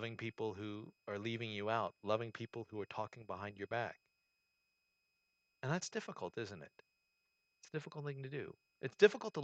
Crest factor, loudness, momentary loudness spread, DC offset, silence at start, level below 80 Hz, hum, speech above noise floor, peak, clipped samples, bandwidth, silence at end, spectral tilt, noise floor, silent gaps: 30 dB; -41 LUFS; 14 LU; under 0.1%; 0 s; -84 dBFS; none; 43 dB; -12 dBFS; under 0.1%; 8.4 kHz; 0 s; -5 dB/octave; -84 dBFS; none